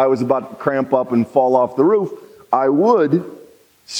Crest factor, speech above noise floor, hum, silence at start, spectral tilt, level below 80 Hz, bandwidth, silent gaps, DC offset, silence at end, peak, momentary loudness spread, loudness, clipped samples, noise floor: 16 dB; 30 dB; none; 0 s; -6.5 dB/octave; -68 dBFS; 10.5 kHz; none; under 0.1%; 0 s; -2 dBFS; 7 LU; -17 LUFS; under 0.1%; -46 dBFS